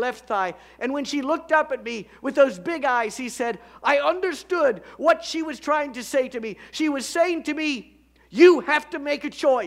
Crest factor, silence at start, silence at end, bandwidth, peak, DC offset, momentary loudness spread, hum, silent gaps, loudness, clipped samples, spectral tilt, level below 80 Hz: 20 dB; 0 s; 0 s; 15 kHz; -4 dBFS; under 0.1%; 9 LU; none; none; -23 LUFS; under 0.1%; -3.5 dB/octave; -62 dBFS